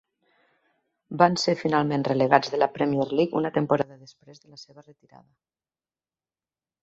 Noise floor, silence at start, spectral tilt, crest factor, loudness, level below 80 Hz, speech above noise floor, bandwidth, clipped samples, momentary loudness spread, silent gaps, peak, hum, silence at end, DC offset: under -90 dBFS; 1.1 s; -6 dB/octave; 24 dB; -23 LUFS; -68 dBFS; over 65 dB; 8 kHz; under 0.1%; 5 LU; none; -2 dBFS; none; 2 s; under 0.1%